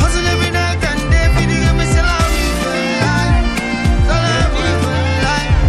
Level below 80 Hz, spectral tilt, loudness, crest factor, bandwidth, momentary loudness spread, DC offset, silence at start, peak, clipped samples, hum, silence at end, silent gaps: -18 dBFS; -5 dB/octave; -15 LUFS; 12 dB; 14 kHz; 3 LU; under 0.1%; 0 s; -2 dBFS; under 0.1%; none; 0 s; none